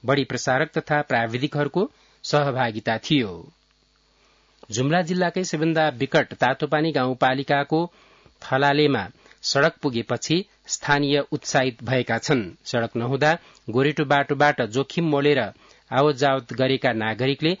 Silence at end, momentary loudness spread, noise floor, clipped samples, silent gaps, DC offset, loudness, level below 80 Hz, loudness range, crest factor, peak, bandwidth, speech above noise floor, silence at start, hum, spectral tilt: 0.05 s; 7 LU; -62 dBFS; under 0.1%; none; under 0.1%; -22 LUFS; -62 dBFS; 3 LU; 18 dB; -4 dBFS; 7.8 kHz; 40 dB; 0.05 s; none; -5 dB/octave